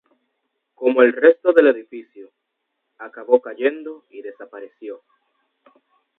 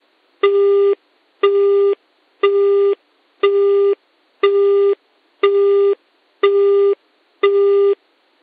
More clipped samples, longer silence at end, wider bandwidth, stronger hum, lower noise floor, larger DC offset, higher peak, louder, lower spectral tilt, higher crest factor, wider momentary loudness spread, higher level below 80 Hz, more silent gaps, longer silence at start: neither; first, 1.25 s vs 0.5 s; second, 4 kHz vs 4.7 kHz; neither; first, -76 dBFS vs -39 dBFS; neither; about the same, 0 dBFS vs 0 dBFS; about the same, -17 LUFS vs -16 LUFS; about the same, -6.5 dB/octave vs -6 dB/octave; first, 20 dB vs 14 dB; first, 24 LU vs 11 LU; about the same, -78 dBFS vs -78 dBFS; neither; first, 0.8 s vs 0.45 s